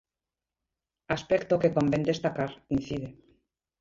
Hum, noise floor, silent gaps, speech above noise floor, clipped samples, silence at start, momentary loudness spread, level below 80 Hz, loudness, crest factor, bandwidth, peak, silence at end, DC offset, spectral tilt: none; under -90 dBFS; none; over 62 dB; under 0.1%; 1.1 s; 11 LU; -56 dBFS; -28 LUFS; 20 dB; 7.6 kHz; -10 dBFS; 0.7 s; under 0.1%; -7 dB/octave